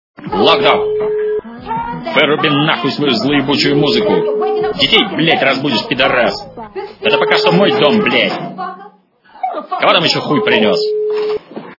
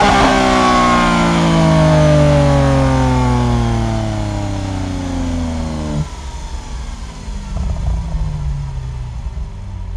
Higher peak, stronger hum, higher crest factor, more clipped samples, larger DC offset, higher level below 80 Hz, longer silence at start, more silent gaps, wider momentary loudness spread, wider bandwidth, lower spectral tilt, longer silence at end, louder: about the same, 0 dBFS vs 0 dBFS; neither; about the same, 14 dB vs 14 dB; neither; neither; second, -48 dBFS vs -24 dBFS; first, 0.2 s vs 0 s; neither; second, 12 LU vs 17 LU; second, 6 kHz vs 12 kHz; about the same, -5.5 dB/octave vs -6 dB/octave; about the same, 0.05 s vs 0 s; about the same, -13 LUFS vs -15 LUFS